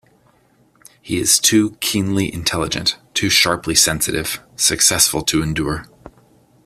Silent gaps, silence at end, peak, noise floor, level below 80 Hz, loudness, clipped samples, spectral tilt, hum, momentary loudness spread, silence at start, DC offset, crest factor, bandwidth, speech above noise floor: none; 0.55 s; 0 dBFS; -56 dBFS; -42 dBFS; -16 LUFS; under 0.1%; -2 dB/octave; none; 10 LU; 1.05 s; under 0.1%; 20 dB; 16 kHz; 38 dB